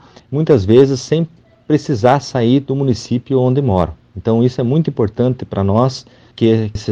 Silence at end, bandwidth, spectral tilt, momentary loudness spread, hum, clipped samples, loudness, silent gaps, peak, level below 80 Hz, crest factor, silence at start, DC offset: 0 s; 8 kHz; -7.5 dB/octave; 8 LU; none; under 0.1%; -15 LUFS; none; 0 dBFS; -42 dBFS; 14 dB; 0.3 s; under 0.1%